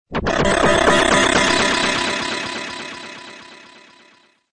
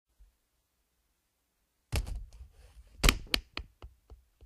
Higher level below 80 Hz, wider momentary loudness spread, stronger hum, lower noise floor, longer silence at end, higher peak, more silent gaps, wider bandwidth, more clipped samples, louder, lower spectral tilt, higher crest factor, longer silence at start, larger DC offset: about the same, -38 dBFS vs -40 dBFS; about the same, 19 LU vs 21 LU; neither; second, -54 dBFS vs -78 dBFS; first, 0.35 s vs 0 s; first, -2 dBFS vs -8 dBFS; neither; second, 10.5 kHz vs 15.5 kHz; neither; first, -16 LUFS vs -33 LUFS; about the same, -3 dB/octave vs -3 dB/octave; second, 18 dB vs 30 dB; second, 0.1 s vs 1.9 s; neither